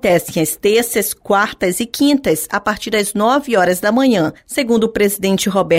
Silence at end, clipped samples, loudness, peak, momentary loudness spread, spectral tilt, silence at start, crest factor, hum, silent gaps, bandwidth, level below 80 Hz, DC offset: 0 s; under 0.1%; -15 LUFS; -2 dBFS; 5 LU; -4 dB/octave; 0.05 s; 14 dB; none; none; 16.5 kHz; -48 dBFS; under 0.1%